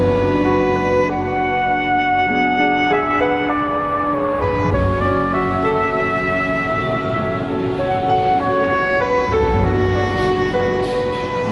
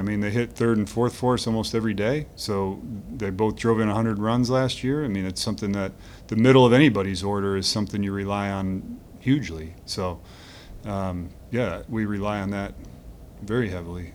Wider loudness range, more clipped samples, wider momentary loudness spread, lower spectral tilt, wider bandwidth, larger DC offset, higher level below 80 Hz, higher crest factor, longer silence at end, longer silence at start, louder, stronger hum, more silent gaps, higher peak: second, 2 LU vs 8 LU; neither; second, 4 LU vs 14 LU; about the same, -7 dB/octave vs -6 dB/octave; second, 11.5 kHz vs 18.5 kHz; neither; first, -34 dBFS vs -46 dBFS; second, 12 dB vs 22 dB; about the same, 0 s vs 0 s; about the same, 0 s vs 0 s; first, -17 LUFS vs -24 LUFS; neither; neither; about the same, -6 dBFS vs -4 dBFS